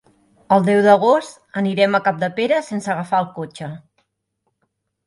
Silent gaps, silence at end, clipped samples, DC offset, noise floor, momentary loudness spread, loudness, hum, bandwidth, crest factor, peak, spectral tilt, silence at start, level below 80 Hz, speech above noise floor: none; 1.3 s; under 0.1%; under 0.1%; -73 dBFS; 16 LU; -17 LUFS; none; 11.5 kHz; 18 dB; 0 dBFS; -6 dB/octave; 0.5 s; -66 dBFS; 55 dB